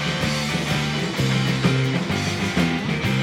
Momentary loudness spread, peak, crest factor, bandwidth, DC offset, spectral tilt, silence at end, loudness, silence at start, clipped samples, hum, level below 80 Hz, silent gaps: 3 LU; -6 dBFS; 14 dB; 16.5 kHz; under 0.1%; -5 dB/octave; 0 s; -22 LUFS; 0 s; under 0.1%; none; -42 dBFS; none